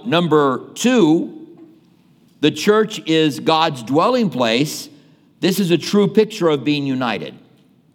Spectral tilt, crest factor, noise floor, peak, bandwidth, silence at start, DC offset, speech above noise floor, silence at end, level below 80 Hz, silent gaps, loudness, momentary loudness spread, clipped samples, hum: -5 dB/octave; 18 dB; -52 dBFS; 0 dBFS; 18 kHz; 0.05 s; under 0.1%; 36 dB; 0.6 s; -72 dBFS; none; -17 LUFS; 8 LU; under 0.1%; none